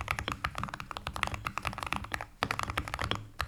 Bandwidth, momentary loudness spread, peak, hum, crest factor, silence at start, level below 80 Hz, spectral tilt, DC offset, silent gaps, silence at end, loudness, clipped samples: over 20 kHz; 6 LU; -8 dBFS; none; 28 dB; 0 s; -48 dBFS; -3.5 dB/octave; under 0.1%; none; 0 s; -36 LUFS; under 0.1%